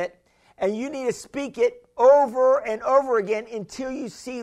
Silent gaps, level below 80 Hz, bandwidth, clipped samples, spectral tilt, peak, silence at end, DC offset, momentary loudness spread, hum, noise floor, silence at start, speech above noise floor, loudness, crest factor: none; -62 dBFS; 11 kHz; under 0.1%; -5 dB/octave; -6 dBFS; 0 s; under 0.1%; 15 LU; none; -57 dBFS; 0 s; 35 dB; -22 LUFS; 18 dB